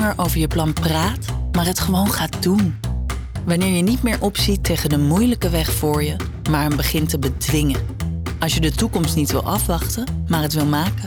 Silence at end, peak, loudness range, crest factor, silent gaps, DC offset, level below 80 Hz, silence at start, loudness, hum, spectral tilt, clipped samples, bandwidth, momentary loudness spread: 0 s; -8 dBFS; 2 LU; 10 dB; none; under 0.1%; -28 dBFS; 0 s; -20 LUFS; none; -5 dB/octave; under 0.1%; over 20 kHz; 6 LU